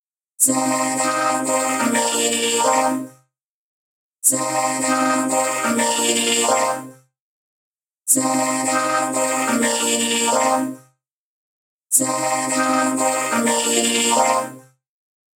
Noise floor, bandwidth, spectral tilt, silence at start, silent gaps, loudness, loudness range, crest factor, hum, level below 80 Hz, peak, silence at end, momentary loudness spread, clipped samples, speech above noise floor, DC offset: -66 dBFS; 18 kHz; -1.5 dB/octave; 0.4 s; 3.44-4.13 s, 7.20-7.75 s, 11.11-11.82 s; -18 LUFS; 2 LU; 20 dB; none; -76 dBFS; -2 dBFS; 0.75 s; 4 LU; under 0.1%; 47 dB; under 0.1%